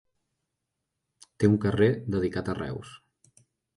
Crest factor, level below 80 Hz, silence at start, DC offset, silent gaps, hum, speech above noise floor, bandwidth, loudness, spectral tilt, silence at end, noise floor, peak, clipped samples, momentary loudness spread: 22 dB; -52 dBFS; 1.4 s; under 0.1%; none; none; 58 dB; 11.5 kHz; -27 LUFS; -8 dB/octave; 0.8 s; -83 dBFS; -8 dBFS; under 0.1%; 14 LU